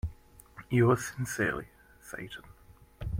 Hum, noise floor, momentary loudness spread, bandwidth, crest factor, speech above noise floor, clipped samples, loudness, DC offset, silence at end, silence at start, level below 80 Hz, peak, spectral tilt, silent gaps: none; -53 dBFS; 25 LU; 16.5 kHz; 18 dB; 24 dB; under 0.1%; -30 LUFS; under 0.1%; 0 s; 0.05 s; -50 dBFS; -14 dBFS; -6 dB/octave; none